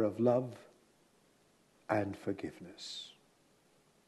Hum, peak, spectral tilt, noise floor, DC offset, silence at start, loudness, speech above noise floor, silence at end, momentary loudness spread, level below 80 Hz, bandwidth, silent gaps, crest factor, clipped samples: none; -16 dBFS; -6.5 dB/octave; -69 dBFS; under 0.1%; 0 s; -37 LUFS; 34 dB; 0.95 s; 20 LU; -78 dBFS; 12.5 kHz; none; 22 dB; under 0.1%